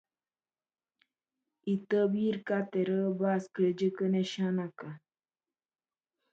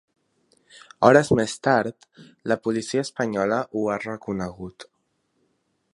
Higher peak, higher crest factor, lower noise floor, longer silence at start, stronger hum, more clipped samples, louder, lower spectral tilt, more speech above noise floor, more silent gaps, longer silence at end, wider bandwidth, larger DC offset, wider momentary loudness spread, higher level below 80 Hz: second, -18 dBFS vs 0 dBFS; second, 16 dB vs 24 dB; first, under -90 dBFS vs -72 dBFS; first, 1.65 s vs 1 s; neither; neither; second, -31 LUFS vs -23 LUFS; first, -7.5 dB/octave vs -5.5 dB/octave; first, over 59 dB vs 49 dB; neither; first, 1.35 s vs 1.1 s; second, 7.8 kHz vs 11.5 kHz; neither; second, 13 LU vs 16 LU; second, -80 dBFS vs -56 dBFS